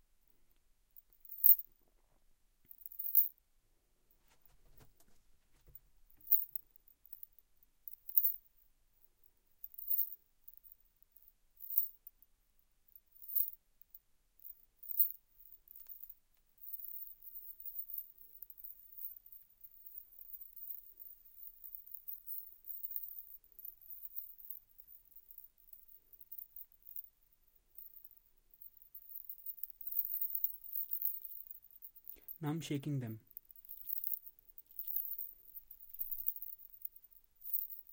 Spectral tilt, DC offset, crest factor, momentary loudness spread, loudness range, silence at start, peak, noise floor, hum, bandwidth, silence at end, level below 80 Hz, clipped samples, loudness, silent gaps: -6 dB/octave; under 0.1%; 34 dB; 25 LU; 13 LU; 1.25 s; -10 dBFS; -74 dBFS; none; 17 kHz; 0 s; -76 dBFS; under 0.1%; -36 LUFS; none